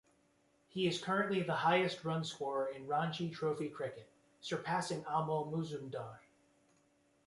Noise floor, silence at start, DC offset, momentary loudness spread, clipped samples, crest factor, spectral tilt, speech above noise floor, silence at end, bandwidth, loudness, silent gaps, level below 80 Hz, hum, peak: -73 dBFS; 0.75 s; under 0.1%; 12 LU; under 0.1%; 20 dB; -5.5 dB/octave; 36 dB; 1.05 s; 11.5 kHz; -37 LUFS; none; -78 dBFS; none; -20 dBFS